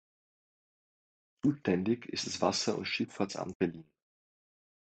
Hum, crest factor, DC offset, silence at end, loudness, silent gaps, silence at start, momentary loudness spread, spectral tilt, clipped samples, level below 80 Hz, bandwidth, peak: none; 24 dB; under 0.1%; 1 s; -33 LUFS; 3.55-3.60 s; 1.45 s; 6 LU; -4.5 dB/octave; under 0.1%; -66 dBFS; 9.2 kHz; -12 dBFS